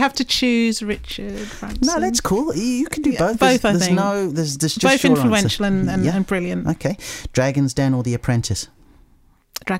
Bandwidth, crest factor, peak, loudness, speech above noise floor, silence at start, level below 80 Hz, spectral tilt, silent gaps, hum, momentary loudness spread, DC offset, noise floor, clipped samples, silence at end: 16 kHz; 18 dB; 0 dBFS; -19 LUFS; 36 dB; 0 s; -40 dBFS; -4.5 dB/octave; none; none; 12 LU; under 0.1%; -54 dBFS; under 0.1%; 0 s